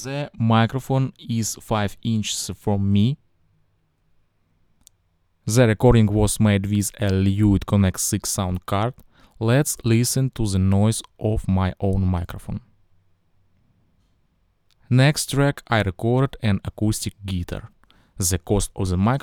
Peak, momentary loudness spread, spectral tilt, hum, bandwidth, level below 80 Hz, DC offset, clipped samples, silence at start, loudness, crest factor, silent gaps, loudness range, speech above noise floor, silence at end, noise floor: -2 dBFS; 9 LU; -5.5 dB/octave; none; 17.5 kHz; -38 dBFS; under 0.1%; under 0.1%; 0 s; -21 LUFS; 20 dB; none; 7 LU; 45 dB; 0.05 s; -66 dBFS